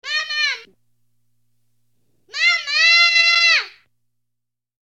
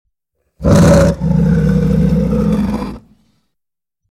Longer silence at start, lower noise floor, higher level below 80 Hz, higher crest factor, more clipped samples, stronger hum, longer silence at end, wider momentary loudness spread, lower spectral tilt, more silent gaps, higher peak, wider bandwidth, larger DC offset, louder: second, 0.05 s vs 0.6 s; about the same, -81 dBFS vs -80 dBFS; second, -78 dBFS vs -24 dBFS; about the same, 16 dB vs 12 dB; neither; first, 60 Hz at -70 dBFS vs none; about the same, 1.15 s vs 1.1 s; first, 17 LU vs 11 LU; second, 4.5 dB/octave vs -7.5 dB/octave; neither; second, -4 dBFS vs 0 dBFS; second, 10 kHz vs 13.5 kHz; neither; about the same, -14 LUFS vs -12 LUFS